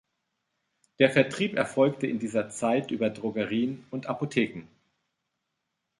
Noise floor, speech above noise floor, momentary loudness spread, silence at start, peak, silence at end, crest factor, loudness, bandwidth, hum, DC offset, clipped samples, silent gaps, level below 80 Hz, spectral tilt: -82 dBFS; 55 dB; 9 LU; 1 s; -6 dBFS; 1.35 s; 22 dB; -27 LUFS; 11.5 kHz; none; under 0.1%; under 0.1%; none; -68 dBFS; -5.5 dB/octave